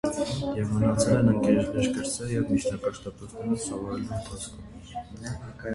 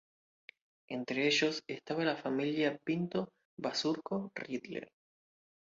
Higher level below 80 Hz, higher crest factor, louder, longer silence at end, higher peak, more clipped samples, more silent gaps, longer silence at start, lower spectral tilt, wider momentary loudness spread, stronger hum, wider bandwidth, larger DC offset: first, -48 dBFS vs -80 dBFS; about the same, 18 dB vs 20 dB; first, -27 LUFS vs -35 LUFS; second, 0 s vs 0.9 s; first, -10 dBFS vs -18 dBFS; neither; second, none vs 3.45-3.57 s; second, 0.05 s vs 0.9 s; first, -6 dB/octave vs -3.5 dB/octave; first, 18 LU vs 12 LU; neither; first, 11.5 kHz vs 7.4 kHz; neither